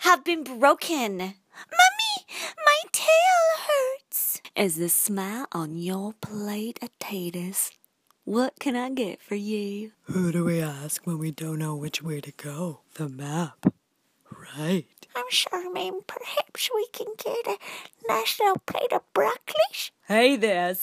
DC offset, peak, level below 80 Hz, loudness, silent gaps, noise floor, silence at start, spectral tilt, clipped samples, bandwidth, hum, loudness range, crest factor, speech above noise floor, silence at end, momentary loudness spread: under 0.1%; -4 dBFS; -72 dBFS; -25 LUFS; none; -66 dBFS; 0 s; -3.5 dB/octave; under 0.1%; 15.5 kHz; none; 9 LU; 22 dB; 40 dB; 0 s; 14 LU